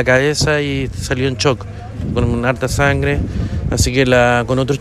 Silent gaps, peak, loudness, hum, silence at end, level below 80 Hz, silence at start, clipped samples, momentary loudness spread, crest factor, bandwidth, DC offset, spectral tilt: none; 0 dBFS; -16 LUFS; none; 0 s; -28 dBFS; 0 s; under 0.1%; 9 LU; 14 dB; 14 kHz; under 0.1%; -5 dB/octave